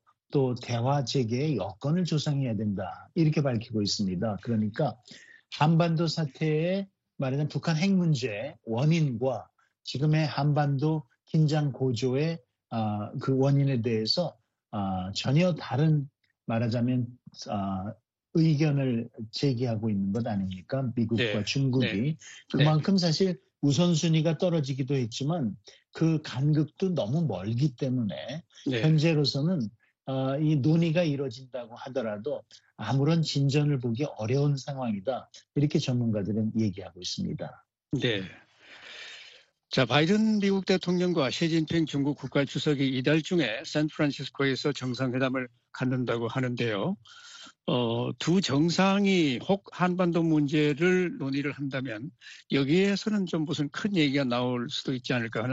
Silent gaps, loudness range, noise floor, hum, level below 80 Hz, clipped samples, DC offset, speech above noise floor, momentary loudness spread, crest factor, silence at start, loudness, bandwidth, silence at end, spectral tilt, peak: none; 3 LU; -54 dBFS; none; -66 dBFS; under 0.1%; under 0.1%; 27 dB; 11 LU; 20 dB; 0.3 s; -28 LUFS; 8 kHz; 0 s; -6.5 dB/octave; -8 dBFS